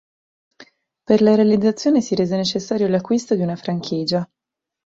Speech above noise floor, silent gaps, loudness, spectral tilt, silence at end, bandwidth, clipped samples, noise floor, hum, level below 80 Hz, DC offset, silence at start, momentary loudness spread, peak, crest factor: 32 dB; none; -19 LUFS; -6 dB/octave; 0.6 s; 7.8 kHz; under 0.1%; -49 dBFS; none; -60 dBFS; under 0.1%; 0.6 s; 9 LU; -2 dBFS; 18 dB